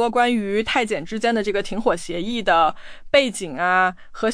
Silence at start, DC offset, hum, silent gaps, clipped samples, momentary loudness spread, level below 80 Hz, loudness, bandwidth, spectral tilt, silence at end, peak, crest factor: 0 s; under 0.1%; none; none; under 0.1%; 7 LU; -44 dBFS; -21 LUFS; 10.5 kHz; -4 dB/octave; 0 s; -4 dBFS; 16 dB